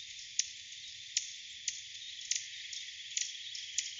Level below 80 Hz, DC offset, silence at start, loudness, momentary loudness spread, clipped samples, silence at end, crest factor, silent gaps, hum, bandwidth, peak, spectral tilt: -80 dBFS; under 0.1%; 0 s; -38 LUFS; 8 LU; under 0.1%; 0 s; 26 dB; none; none; 8.8 kHz; -14 dBFS; 5.5 dB/octave